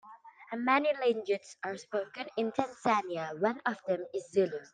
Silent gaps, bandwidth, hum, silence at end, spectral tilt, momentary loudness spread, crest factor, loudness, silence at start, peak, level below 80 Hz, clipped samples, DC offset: none; 9.6 kHz; none; 0.05 s; -5 dB/octave; 10 LU; 20 dB; -32 LUFS; 0.05 s; -12 dBFS; -80 dBFS; under 0.1%; under 0.1%